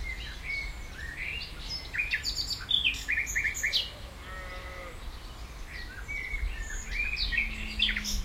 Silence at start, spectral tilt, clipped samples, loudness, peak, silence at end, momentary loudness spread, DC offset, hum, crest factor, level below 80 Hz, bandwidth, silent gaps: 0 s; -1.5 dB/octave; under 0.1%; -31 LUFS; -12 dBFS; 0 s; 15 LU; under 0.1%; none; 22 dB; -40 dBFS; 16 kHz; none